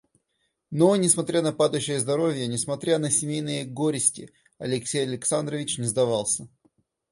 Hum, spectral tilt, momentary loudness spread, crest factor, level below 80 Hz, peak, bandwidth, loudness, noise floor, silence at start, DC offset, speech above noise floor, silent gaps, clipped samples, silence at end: none; -4 dB/octave; 8 LU; 20 dB; -64 dBFS; -4 dBFS; 11.5 kHz; -24 LUFS; -75 dBFS; 0.7 s; under 0.1%; 51 dB; none; under 0.1%; 0.65 s